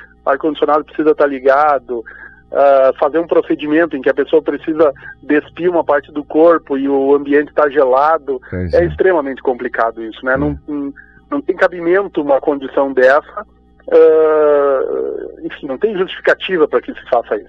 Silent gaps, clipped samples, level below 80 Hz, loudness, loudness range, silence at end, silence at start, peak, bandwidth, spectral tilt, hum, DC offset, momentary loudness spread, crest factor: none; under 0.1%; -42 dBFS; -14 LUFS; 4 LU; 0.05 s; 0 s; -2 dBFS; 6.2 kHz; -7.5 dB/octave; 60 Hz at -50 dBFS; under 0.1%; 12 LU; 12 dB